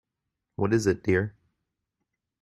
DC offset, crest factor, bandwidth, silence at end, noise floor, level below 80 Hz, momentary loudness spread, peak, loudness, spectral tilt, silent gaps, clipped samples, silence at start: under 0.1%; 20 dB; 13 kHz; 1.1 s; -84 dBFS; -60 dBFS; 12 LU; -10 dBFS; -26 LUFS; -6.5 dB/octave; none; under 0.1%; 0.6 s